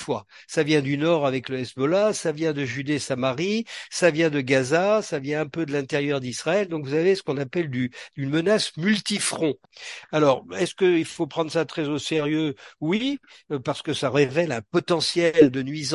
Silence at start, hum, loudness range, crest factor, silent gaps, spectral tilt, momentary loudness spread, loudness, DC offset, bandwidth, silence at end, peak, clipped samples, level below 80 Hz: 0 s; none; 2 LU; 20 dB; none; -5 dB/octave; 8 LU; -24 LUFS; under 0.1%; 11.5 kHz; 0 s; -2 dBFS; under 0.1%; -66 dBFS